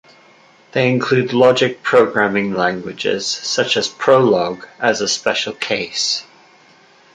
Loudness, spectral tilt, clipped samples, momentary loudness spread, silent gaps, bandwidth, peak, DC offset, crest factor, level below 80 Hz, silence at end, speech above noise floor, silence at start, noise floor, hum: -16 LUFS; -3.5 dB/octave; under 0.1%; 8 LU; none; 9.4 kHz; 0 dBFS; under 0.1%; 16 dB; -60 dBFS; 0.95 s; 33 dB; 0.75 s; -49 dBFS; none